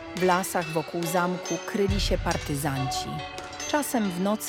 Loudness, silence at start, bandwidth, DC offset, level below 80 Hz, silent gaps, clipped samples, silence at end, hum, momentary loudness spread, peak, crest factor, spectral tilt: -27 LUFS; 0 s; 18 kHz; under 0.1%; -40 dBFS; none; under 0.1%; 0 s; none; 6 LU; -8 dBFS; 18 dB; -4.5 dB/octave